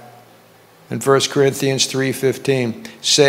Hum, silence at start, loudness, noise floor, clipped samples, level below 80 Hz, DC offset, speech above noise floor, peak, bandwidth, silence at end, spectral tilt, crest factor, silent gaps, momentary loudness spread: none; 0.05 s; -18 LUFS; -48 dBFS; under 0.1%; -68 dBFS; under 0.1%; 31 dB; 0 dBFS; 16 kHz; 0 s; -3.5 dB/octave; 18 dB; none; 7 LU